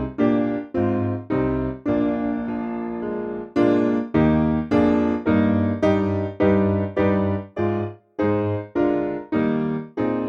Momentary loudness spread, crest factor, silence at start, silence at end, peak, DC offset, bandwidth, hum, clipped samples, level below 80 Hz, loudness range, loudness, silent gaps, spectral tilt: 8 LU; 16 dB; 0 s; 0 s; -6 dBFS; under 0.1%; 6.6 kHz; none; under 0.1%; -44 dBFS; 4 LU; -22 LUFS; none; -9.5 dB/octave